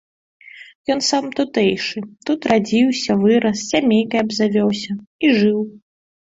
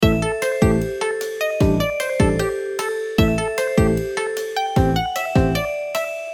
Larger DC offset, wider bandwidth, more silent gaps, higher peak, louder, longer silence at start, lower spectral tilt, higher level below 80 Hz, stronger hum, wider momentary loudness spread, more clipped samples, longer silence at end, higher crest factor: neither; second, 7.8 kHz vs 19 kHz; first, 0.75-0.84 s, 5.07-5.19 s vs none; about the same, -2 dBFS vs -4 dBFS; about the same, -18 LUFS vs -20 LUFS; first, 0.45 s vs 0 s; second, -4.5 dB/octave vs -6 dB/octave; second, -58 dBFS vs -32 dBFS; neither; first, 10 LU vs 6 LU; neither; first, 0.45 s vs 0 s; about the same, 18 dB vs 16 dB